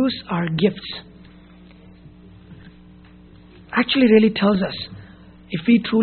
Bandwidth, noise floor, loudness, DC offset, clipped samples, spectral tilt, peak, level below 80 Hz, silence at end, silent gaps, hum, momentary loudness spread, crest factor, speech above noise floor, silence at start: 4.5 kHz; -46 dBFS; -19 LUFS; under 0.1%; under 0.1%; -4.5 dB/octave; -2 dBFS; -52 dBFS; 0 s; none; none; 18 LU; 20 dB; 27 dB; 0 s